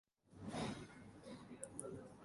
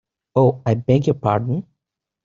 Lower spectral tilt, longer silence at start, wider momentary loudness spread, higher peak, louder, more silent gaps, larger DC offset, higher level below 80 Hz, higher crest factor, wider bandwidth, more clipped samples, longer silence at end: second, -4.5 dB/octave vs -8.5 dB/octave; about the same, 0.25 s vs 0.35 s; first, 11 LU vs 7 LU; second, -26 dBFS vs -2 dBFS; second, -51 LUFS vs -19 LUFS; neither; neither; second, -72 dBFS vs -52 dBFS; first, 26 dB vs 18 dB; first, 11.5 kHz vs 7.2 kHz; neither; second, 0 s vs 0.65 s